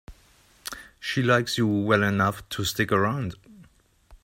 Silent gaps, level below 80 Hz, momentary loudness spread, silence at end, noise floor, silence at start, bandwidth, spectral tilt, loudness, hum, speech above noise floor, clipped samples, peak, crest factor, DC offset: none; -54 dBFS; 16 LU; 0.1 s; -58 dBFS; 0.1 s; 16 kHz; -5 dB/octave; -24 LUFS; none; 34 dB; under 0.1%; -4 dBFS; 22 dB; under 0.1%